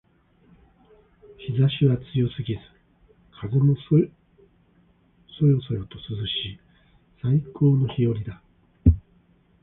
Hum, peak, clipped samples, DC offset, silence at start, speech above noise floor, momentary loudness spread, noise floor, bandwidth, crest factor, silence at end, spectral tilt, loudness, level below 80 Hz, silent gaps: none; -4 dBFS; under 0.1%; under 0.1%; 1.4 s; 38 dB; 12 LU; -60 dBFS; 4 kHz; 20 dB; 0.65 s; -12 dB/octave; -24 LUFS; -38 dBFS; none